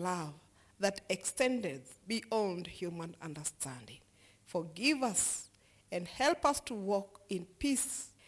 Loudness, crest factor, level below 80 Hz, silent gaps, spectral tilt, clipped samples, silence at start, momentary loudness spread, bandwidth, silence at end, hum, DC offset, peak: -35 LUFS; 20 dB; -64 dBFS; none; -3 dB/octave; under 0.1%; 0 s; 12 LU; 12 kHz; 0.2 s; none; under 0.1%; -18 dBFS